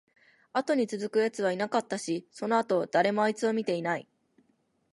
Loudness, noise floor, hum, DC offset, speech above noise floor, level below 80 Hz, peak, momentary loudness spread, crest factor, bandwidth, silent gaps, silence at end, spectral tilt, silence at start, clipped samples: -29 LUFS; -71 dBFS; none; under 0.1%; 43 dB; -80 dBFS; -12 dBFS; 7 LU; 18 dB; 11.5 kHz; none; 0.9 s; -5 dB/octave; 0.55 s; under 0.1%